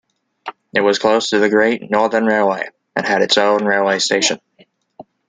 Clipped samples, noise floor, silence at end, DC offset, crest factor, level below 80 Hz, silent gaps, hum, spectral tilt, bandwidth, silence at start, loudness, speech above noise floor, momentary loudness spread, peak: under 0.1%; -54 dBFS; 0.25 s; under 0.1%; 16 dB; -62 dBFS; none; none; -3 dB/octave; 9.6 kHz; 0.45 s; -16 LUFS; 38 dB; 11 LU; -2 dBFS